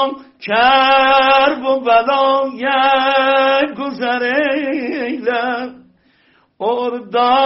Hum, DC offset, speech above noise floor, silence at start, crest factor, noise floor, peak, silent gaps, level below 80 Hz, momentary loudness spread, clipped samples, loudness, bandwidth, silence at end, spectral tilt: none; under 0.1%; 40 dB; 0 s; 14 dB; -55 dBFS; -2 dBFS; none; -54 dBFS; 11 LU; under 0.1%; -14 LUFS; 5.8 kHz; 0 s; 0.5 dB/octave